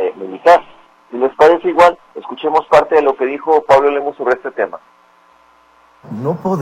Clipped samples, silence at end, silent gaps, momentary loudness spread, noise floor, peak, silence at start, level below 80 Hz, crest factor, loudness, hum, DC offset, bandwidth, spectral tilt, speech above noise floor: under 0.1%; 0 s; none; 12 LU; -49 dBFS; 0 dBFS; 0 s; -52 dBFS; 14 dB; -13 LUFS; none; under 0.1%; 12 kHz; -6 dB/octave; 37 dB